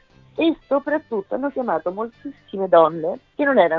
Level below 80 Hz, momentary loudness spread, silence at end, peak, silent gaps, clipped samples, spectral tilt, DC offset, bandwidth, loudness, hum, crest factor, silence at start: -62 dBFS; 15 LU; 0 s; -2 dBFS; none; under 0.1%; -8.5 dB/octave; under 0.1%; 4.9 kHz; -21 LUFS; none; 18 dB; 0.35 s